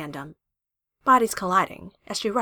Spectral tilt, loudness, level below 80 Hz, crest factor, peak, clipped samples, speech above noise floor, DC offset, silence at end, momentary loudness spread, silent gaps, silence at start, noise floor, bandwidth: -3.5 dB/octave; -23 LUFS; -60 dBFS; 18 dB; -8 dBFS; under 0.1%; 62 dB; under 0.1%; 0 s; 21 LU; none; 0 s; -86 dBFS; over 20 kHz